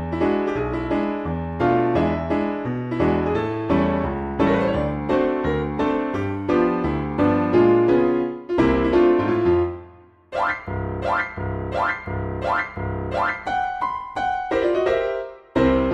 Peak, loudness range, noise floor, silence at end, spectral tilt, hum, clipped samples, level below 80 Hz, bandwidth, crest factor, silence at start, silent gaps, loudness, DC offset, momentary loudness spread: -6 dBFS; 6 LU; -47 dBFS; 0 s; -8.5 dB/octave; none; under 0.1%; -38 dBFS; 7.6 kHz; 16 dB; 0 s; none; -22 LUFS; under 0.1%; 9 LU